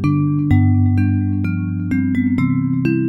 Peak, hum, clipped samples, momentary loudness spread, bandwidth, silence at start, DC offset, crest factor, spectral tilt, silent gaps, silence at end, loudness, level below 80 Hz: -2 dBFS; none; under 0.1%; 6 LU; 4.8 kHz; 0 s; under 0.1%; 14 dB; -10.5 dB/octave; none; 0 s; -17 LUFS; -40 dBFS